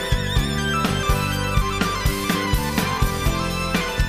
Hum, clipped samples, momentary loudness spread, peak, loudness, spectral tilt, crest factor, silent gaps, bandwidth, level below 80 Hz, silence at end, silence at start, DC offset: none; under 0.1%; 1 LU; -6 dBFS; -22 LUFS; -4.5 dB/octave; 16 dB; none; 15.5 kHz; -26 dBFS; 0 s; 0 s; 0.1%